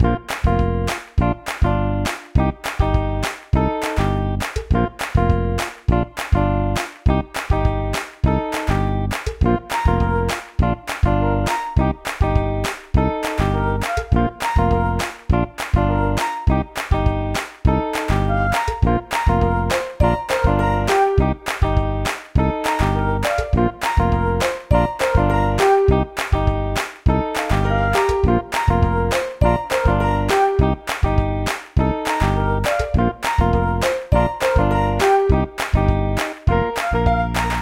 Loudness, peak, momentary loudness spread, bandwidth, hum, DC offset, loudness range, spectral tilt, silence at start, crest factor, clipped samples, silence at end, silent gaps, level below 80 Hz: -20 LUFS; -2 dBFS; 5 LU; 16.5 kHz; none; under 0.1%; 3 LU; -6.5 dB/octave; 0 s; 16 dB; under 0.1%; 0 s; none; -24 dBFS